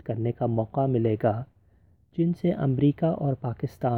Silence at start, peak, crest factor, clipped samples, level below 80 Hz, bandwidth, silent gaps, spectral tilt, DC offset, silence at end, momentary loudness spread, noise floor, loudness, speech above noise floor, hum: 0.05 s; -10 dBFS; 16 dB; under 0.1%; -56 dBFS; 6 kHz; none; -10.5 dB/octave; under 0.1%; 0 s; 9 LU; -60 dBFS; -26 LUFS; 35 dB; none